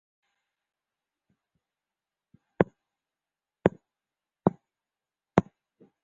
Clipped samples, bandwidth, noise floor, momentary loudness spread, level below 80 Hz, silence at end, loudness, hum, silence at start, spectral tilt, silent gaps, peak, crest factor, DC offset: under 0.1%; 7.4 kHz; under -90 dBFS; 2 LU; -60 dBFS; 0.65 s; -29 LUFS; none; 2.6 s; -7.5 dB/octave; none; -2 dBFS; 32 dB; under 0.1%